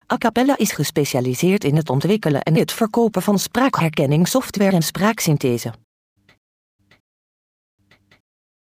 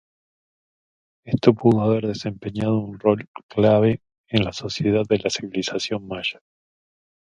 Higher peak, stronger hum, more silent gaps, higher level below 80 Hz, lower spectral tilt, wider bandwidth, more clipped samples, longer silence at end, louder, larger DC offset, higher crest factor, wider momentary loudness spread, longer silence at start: second, -4 dBFS vs 0 dBFS; neither; second, none vs 3.28-3.34 s, 3.43-3.49 s, 4.18-4.24 s; about the same, -56 dBFS vs -52 dBFS; about the same, -5.5 dB/octave vs -6 dB/octave; first, 15.5 kHz vs 9.4 kHz; neither; first, 2.9 s vs 0.9 s; first, -18 LUFS vs -22 LUFS; neither; second, 16 dB vs 22 dB; second, 2 LU vs 10 LU; second, 0.1 s vs 1.25 s